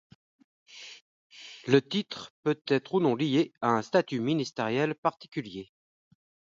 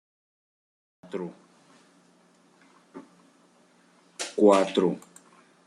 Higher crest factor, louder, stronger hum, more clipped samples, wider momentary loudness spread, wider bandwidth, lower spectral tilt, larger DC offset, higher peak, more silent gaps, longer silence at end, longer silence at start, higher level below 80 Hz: about the same, 22 dB vs 24 dB; second, -28 LUFS vs -25 LUFS; neither; neither; second, 20 LU vs 29 LU; second, 7.6 kHz vs 12 kHz; about the same, -6 dB/octave vs -5 dB/octave; neither; about the same, -8 dBFS vs -6 dBFS; first, 1.01-1.30 s, 2.30-2.43 s, 4.98-5.03 s, 5.28-5.32 s vs none; about the same, 0.8 s vs 0.7 s; second, 0.75 s vs 1.15 s; first, -74 dBFS vs -80 dBFS